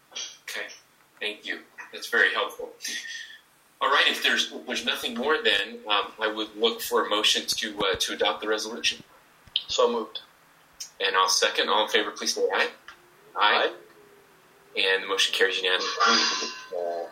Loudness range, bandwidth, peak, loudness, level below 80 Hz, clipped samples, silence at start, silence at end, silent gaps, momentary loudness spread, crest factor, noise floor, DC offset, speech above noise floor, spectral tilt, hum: 3 LU; 16 kHz; -4 dBFS; -25 LUFS; -66 dBFS; under 0.1%; 0.1 s; 0 s; none; 14 LU; 24 dB; -57 dBFS; under 0.1%; 32 dB; 0 dB/octave; none